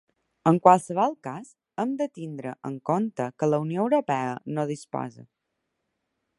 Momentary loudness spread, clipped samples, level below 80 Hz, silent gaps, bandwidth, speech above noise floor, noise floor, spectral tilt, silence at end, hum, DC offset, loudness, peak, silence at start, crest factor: 16 LU; under 0.1%; -70 dBFS; none; 11.5 kHz; 55 dB; -80 dBFS; -7 dB/octave; 1.15 s; none; under 0.1%; -26 LUFS; -2 dBFS; 0.45 s; 24 dB